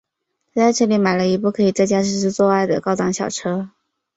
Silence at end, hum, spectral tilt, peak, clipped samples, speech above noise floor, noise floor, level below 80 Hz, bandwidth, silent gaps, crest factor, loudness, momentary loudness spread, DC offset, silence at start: 0.5 s; none; -5 dB/octave; -4 dBFS; under 0.1%; 57 dB; -74 dBFS; -58 dBFS; 8 kHz; none; 14 dB; -18 LUFS; 8 LU; under 0.1%; 0.55 s